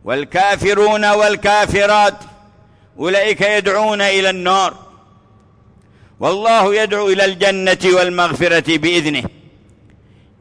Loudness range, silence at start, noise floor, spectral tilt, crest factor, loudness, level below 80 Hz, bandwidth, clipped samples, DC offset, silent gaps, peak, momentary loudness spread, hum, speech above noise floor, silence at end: 3 LU; 0.05 s; -48 dBFS; -3.5 dB/octave; 12 dB; -14 LUFS; -46 dBFS; 10.5 kHz; under 0.1%; under 0.1%; none; -4 dBFS; 6 LU; none; 35 dB; 1.1 s